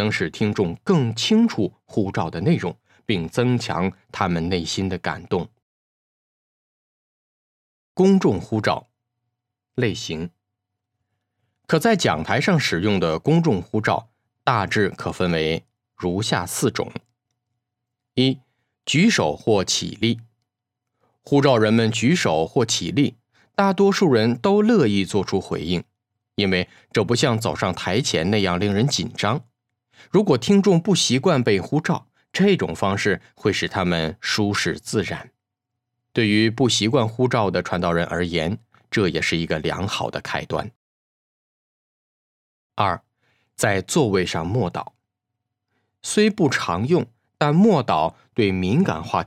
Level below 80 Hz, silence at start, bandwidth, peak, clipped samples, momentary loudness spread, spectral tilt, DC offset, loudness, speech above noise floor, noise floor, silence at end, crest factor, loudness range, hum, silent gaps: -56 dBFS; 0 s; 15 kHz; 0 dBFS; under 0.1%; 10 LU; -5 dB/octave; under 0.1%; -21 LUFS; 62 dB; -82 dBFS; 0 s; 20 dB; 6 LU; none; 5.62-7.95 s, 40.76-42.70 s